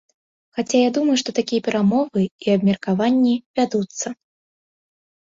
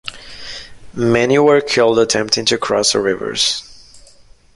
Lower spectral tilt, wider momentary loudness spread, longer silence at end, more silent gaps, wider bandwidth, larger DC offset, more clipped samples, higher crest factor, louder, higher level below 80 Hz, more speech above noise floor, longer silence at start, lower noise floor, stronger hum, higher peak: first, -5.5 dB/octave vs -3 dB/octave; second, 11 LU vs 18 LU; first, 1.2 s vs 0.55 s; first, 2.31-2.39 s, 3.46-3.54 s vs none; second, 7.8 kHz vs 11.5 kHz; neither; neither; about the same, 16 dB vs 16 dB; second, -20 LUFS vs -14 LUFS; second, -62 dBFS vs -48 dBFS; first, over 71 dB vs 31 dB; first, 0.55 s vs 0.05 s; first, under -90 dBFS vs -45 dBFS; neither; second, -6 dBFS vs -2 dBFS